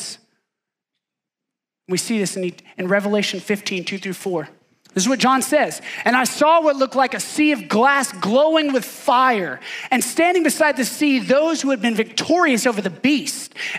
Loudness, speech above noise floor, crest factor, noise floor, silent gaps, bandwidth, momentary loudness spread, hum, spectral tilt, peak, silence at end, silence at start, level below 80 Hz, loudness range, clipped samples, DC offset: -18 LUFS; 66 dB; 16 dB; -85 dBFS; none; 16 kHz; 11 LU; none; -3.5 dB/octave; -4 dBFS; 0 s; 0 s; -76 dBFS; 6 LU; under 0.1%; under 0.1%